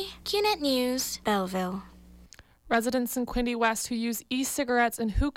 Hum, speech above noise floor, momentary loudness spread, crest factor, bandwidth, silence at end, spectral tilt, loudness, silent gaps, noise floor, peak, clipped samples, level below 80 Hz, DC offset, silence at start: none; 26 dB; 5 LU; 14 dB; 17 kHz; 0.05 s; -3.5 dB/octave; -28 LUFS; none; -54 dBFS; -14 dBFS; under 0.1%; -42 dBFS; under 0.1%; 0 s